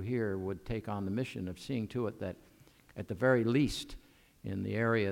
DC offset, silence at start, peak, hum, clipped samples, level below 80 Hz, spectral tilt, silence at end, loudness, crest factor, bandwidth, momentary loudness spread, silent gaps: under 0.1%; 0 s; -16 dBFS; none; under 0.1%; -56 dBFS; -6.5 dB/octave; 0 s; -34 LUFS; 18 dB; 16.5 kHz; 17 LU; none